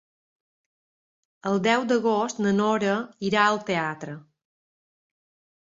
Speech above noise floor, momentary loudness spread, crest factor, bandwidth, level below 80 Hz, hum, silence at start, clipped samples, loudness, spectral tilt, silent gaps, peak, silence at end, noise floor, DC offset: over 66 dB; 13 LU; 20 dB; 7.8 kHz; -68 dBFS; none; 1.45 s; under 0.1%; -24 LUFS; -5 dB/octave; none; -6 dBFS; 1.55 s; under -90 dBFS; under 0.1%